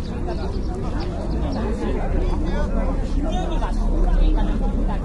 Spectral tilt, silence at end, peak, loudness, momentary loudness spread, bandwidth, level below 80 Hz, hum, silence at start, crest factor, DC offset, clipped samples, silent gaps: -7.5 dB/octave; 0 s; -8 dBFS; -25 LUFS; 5 LU; 7.4 kHz; -22 dBFS; none; 0 s; 12 dB; under 0.1%; under 0.1%; none